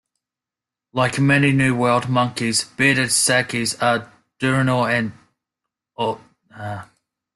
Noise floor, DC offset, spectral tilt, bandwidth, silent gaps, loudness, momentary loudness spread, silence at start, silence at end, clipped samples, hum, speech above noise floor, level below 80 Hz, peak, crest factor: -88 dBFS; under 0.1%; -4 dB/octave; 12.5 kHz; none; -19 LUFS; 16 LU; 0.95 s; 0.5 s; under 0.1%; none; 69 dB; -56 dBFS; -4 dBFS; 18 dB